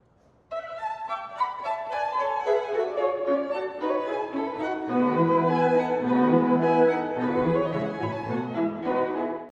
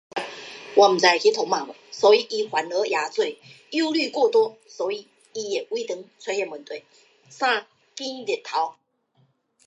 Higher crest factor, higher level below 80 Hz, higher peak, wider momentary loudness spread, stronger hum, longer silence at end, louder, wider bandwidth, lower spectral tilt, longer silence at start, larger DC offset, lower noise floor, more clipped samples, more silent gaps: about the same, 18 dB vs 22 dB; first, -62 dBFS vs -82 dBFS; second, -8 dBFS vs -2 dBFS; second, 10 LU vs 17 LU; neither; second, 0 s vs 0.95 s; second, -26 LUFS vs -23 LUFS; second, 7.8 kHz vs 9.8 kHz; first, -8 dB/octave vs -2.5 dB/octave; first, 0.5 s vs 0.15 s; neither; second, -60 dBFS vs -65 dBFS; neither; neither